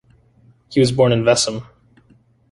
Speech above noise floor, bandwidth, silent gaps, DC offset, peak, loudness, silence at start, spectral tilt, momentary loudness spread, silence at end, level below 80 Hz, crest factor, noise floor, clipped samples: 39 dB; 11.5 kHz; none; under 0.1%; -2 dBFS; -16 LUFS; 0.7 s; -5 dB/octave; 8 LU; 0.9 s; -50 dBFS; 18 dB; -54 dBFS; under 0.1%